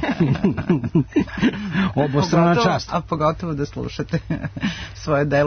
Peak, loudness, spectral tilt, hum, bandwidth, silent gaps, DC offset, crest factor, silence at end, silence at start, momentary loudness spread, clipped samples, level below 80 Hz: -6 dBFS; -21 LUFS; -7 dB/octave; none; 6.6 kHz; none; under 0.1%; 14 dB; 0 s; 0 s; 10 LU; under 0.1%; -42 dBFS